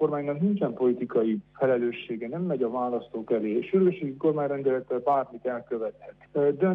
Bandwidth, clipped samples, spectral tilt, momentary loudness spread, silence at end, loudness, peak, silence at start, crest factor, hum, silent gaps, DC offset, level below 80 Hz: 3.9 kHz; under 0.1%; -10.5 dB/octave; 9 LU; 0 s; -27 LUFS; -12 dBFS; 0 s; 14 dB; 50 Hz at -55 dBFS; none; under 0.1%; -68 dBFS